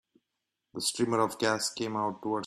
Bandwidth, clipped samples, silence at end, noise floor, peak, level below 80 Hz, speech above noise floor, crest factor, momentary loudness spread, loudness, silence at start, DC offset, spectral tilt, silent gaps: 14.5 kHz; under 0.1%; 0 s; -85 dBFS; -12 dBFS; -72 dBFS; 55 dB; 20 dB; 5 LU; -30 LUFS; 0.75 s; under 0.1%; -3.5 dB/octave; none